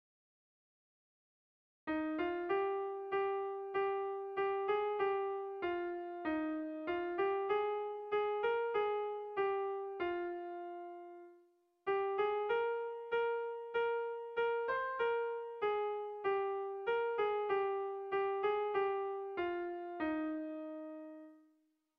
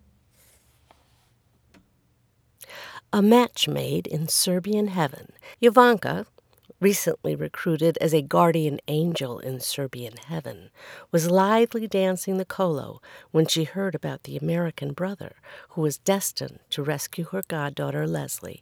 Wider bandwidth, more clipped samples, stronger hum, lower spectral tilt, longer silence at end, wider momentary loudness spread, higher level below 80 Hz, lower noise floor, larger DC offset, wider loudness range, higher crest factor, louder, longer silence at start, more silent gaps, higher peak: second, 5 kHz vs 19.5 kHz; neither; neither; first, -6.5 dB/octave vs -5 dB/octave; first, 0.6 s vs 0.1 s; second, 8 LU vs 17 LU; second, -76 dBFS vs -66 dBFS; first, -76 dBFS vs -65 dBFS; neither; second, 3 LU vs 6 LU; second, 14 dB vs 24 dB; second, -38 LUFS vs -24 LUFS; second, 1.85 s vs 2.6 s; neither; second, -24 dBFS vs 0 dBFS